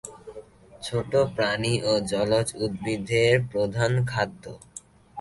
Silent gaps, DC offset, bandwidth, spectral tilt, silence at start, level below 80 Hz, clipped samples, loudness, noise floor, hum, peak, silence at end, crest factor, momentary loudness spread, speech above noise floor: none; under 0.1%; 11.5 kHz; -5 dB/octave; 0.05 s; -52 dBFS; under 0.1%; -25 LUFS; -47 dBFS; none; -8 dBFS; 0 s; 18 dB; 21 LU; 23 dB